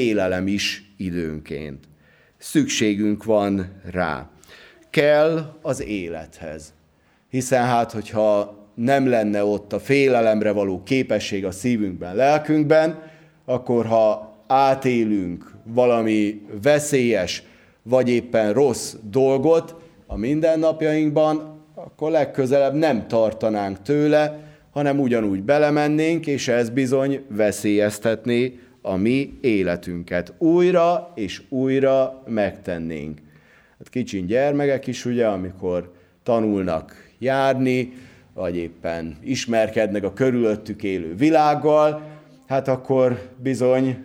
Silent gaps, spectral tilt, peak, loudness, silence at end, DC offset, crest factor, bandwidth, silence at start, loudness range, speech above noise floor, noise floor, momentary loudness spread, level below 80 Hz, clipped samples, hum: none; -6 dB/octave; -4 dBFS; -21 LUFS; 0 s; under 0.1%; 18 dB; 16.5 kHz; 0 s; 4 LU; 39 dB; -59 dBFS; 12 LU; -54 dBFS; under 0.1%; none